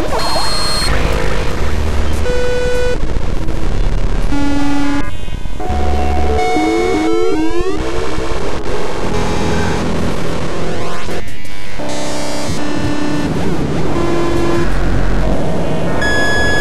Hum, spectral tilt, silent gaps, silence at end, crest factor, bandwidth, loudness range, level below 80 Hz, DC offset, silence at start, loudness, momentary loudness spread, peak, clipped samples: none; -5 dB/octave; none; 0 s; 14 dB; 14 kHz; 4 LU; -20 dBFS; 20%; 0 s; -17 LUFS; 7 LU; -2 dBFS; under 0.1%